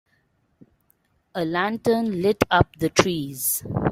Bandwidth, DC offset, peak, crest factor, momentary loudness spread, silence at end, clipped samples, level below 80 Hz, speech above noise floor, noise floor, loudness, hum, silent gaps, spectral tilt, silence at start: 16 kHz; under 0.1%; -2 dBFS; 22 dB; 6 LU; 0 s; under 0.1%; -48 dBFS; 45 dB; -67 dBFS; -22 LUFS; none; none; -4.5 dB/octave; 1.35 s